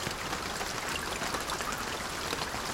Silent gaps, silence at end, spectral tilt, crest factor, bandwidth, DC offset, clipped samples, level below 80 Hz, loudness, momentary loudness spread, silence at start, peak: none; 0 s; -2 dB/octave; 20 dB; over 20 kHz; under 0.1%; under 0.1%; -50 dBFS; -33 LUFS; 1 LU; 0 s; -14 dBFS